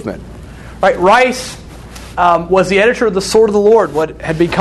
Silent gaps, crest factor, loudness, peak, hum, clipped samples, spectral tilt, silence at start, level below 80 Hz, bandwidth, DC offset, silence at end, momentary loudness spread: none; 12 dB; -12 LUFS; 0 dBFS; none; under 0.1%; -5 dB/octave; 0 s; -36 dBFS; 12.5 kHz; under 0.1%; 0 s; 22 LU